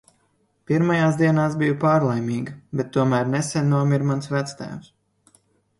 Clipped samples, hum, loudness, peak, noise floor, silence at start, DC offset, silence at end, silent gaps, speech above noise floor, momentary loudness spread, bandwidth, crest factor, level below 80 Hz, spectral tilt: under 0.1%; none; -21 LUFS; -6 dBFS; -66 dBFS; 0.7 s; under 0.1%; 0.95 s; none; 45 dB; 11 LU; 11.5 kHz; 16 dB; -60 dBFS; -7 dB/octave